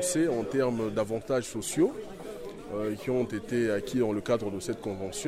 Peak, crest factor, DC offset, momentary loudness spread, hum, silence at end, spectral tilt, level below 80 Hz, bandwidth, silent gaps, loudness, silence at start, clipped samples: -14 dBFS; 16 dB; under 0.1%; 11 LU; none; 0 s; -5 dB/octave; -56 dBFS; 15.5 kHz; none; -30 LUFS; 0 s; under 0.1%